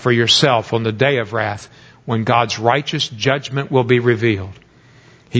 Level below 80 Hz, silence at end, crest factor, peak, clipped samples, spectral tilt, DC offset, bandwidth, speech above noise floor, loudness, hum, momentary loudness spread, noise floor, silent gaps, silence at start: -48 dBFS; 0 s; 18 dB; 0 dBFS; under 0.1%; -5 dB/octave; under 0.1%; 8 kHz; 31 dB; -16 LUFS; none; 11 LU; -47 dBFS; none; 0 s